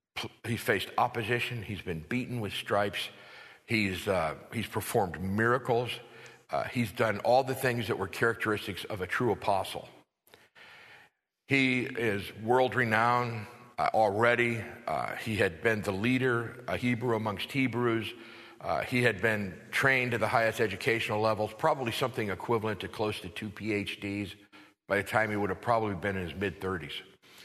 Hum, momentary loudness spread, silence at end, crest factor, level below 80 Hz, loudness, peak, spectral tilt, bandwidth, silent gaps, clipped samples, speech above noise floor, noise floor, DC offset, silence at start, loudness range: none; 11 LU; 0 s; 22 dB; -62 dBFS; -30 LUFS; -8 dBFS; -5.5 dB/octave; 13.5 kHz; none; under 0.1%; 34 dB; -64 dBFS; under 0.1%; 0.15 s; 4 LU